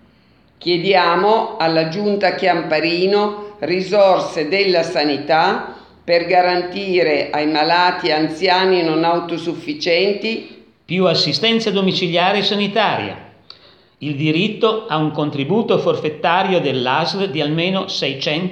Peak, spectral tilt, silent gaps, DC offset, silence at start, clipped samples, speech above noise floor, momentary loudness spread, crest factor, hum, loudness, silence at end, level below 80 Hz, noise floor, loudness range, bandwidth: 0 dBFS; -5.5 dB/octave; none; under 0.1%; 0.6 s; under 0.1%; 36 dB; 8 LU; 16 dB; none; -17 LUFS; 0 s; -62 dBFS; -53 dBFS; 2 LU; 9.2 kHz